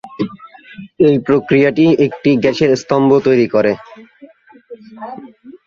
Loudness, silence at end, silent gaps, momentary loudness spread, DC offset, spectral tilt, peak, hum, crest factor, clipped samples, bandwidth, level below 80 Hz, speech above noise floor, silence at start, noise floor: -13 LUFS; 0.1 s; none; 19 LU; under 0.1%; -7 dB/octave; 0 dBFS; none; 14 dB; under 0.1%; 7.4 kHz; -54 dBFS; 30 dB; 0.05 s; -42 dBFS